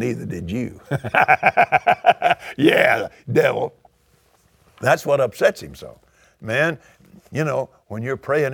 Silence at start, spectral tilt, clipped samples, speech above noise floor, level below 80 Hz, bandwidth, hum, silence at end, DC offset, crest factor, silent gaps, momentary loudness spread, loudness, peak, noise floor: 0 s; -5.5 dB/octave; under 0.1%; 40 dB; -54 dBFS; 19 kHz; none; 0 s; under 0.1%; 20 dB; none; 15 LU; -19 LUFS; 0 dBFS; -59 dBFS